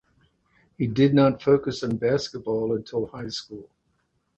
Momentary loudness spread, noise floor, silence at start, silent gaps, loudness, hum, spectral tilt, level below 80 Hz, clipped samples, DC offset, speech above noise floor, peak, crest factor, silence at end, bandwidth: 14 LU; -71 dBFS; 0.8 s; none; -24 LUFS; none; -7 dB/octave; -56 dBFS; under 0.1%; under 0.1%; 48 dB; -6 dBFS; 18 dB; 0.75 s; 8.2 kHz